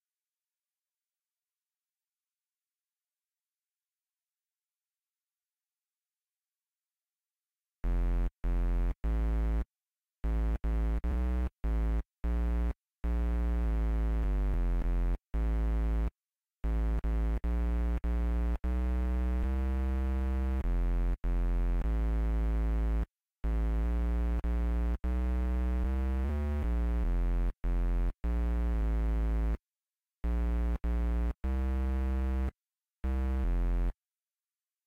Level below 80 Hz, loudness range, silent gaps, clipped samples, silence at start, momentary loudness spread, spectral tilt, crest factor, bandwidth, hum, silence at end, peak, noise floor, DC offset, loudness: -32 dBFS; 3 LU; none; under 0.1%; 7.85 s; 4 LU; -9 dB/octave; 6 dB; 3.7 kHz; none; 0.95 s; -24 dBFS; under -90 dBFS; under 0.1%; -34 LUFS